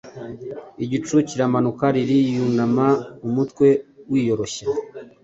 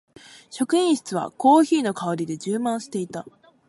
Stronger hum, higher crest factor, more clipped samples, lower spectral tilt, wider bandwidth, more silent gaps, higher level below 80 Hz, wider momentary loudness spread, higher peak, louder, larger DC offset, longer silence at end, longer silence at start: neither; about the same, 16 dB vs 18 dB; neither; first, -6.5 dB/octave vs -5 dB/octave; second, 8 kHz vs 11.5 kHz; neither; first, -58 dBFS vs -72 dBFS; first, 16 LU vs 13 LU; about the same, -4 dBFS vs -6 dBFS; about the same, -21 LUFS vs -22 LUFS; neither; second, 0.15 s vs 0.4 s; second, 0.05 s vs 0.5 s